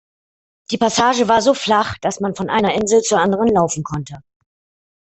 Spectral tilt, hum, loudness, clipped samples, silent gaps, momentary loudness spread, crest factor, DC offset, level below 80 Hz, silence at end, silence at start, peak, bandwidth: -4 dB/octave; none; -17 LUFS; under 0.1%; none; 11 LU; 16 dB; under 0.1%; -50 dBFS; 0.85 s; 0.7 s; -2 dBFS; 8.4 kHz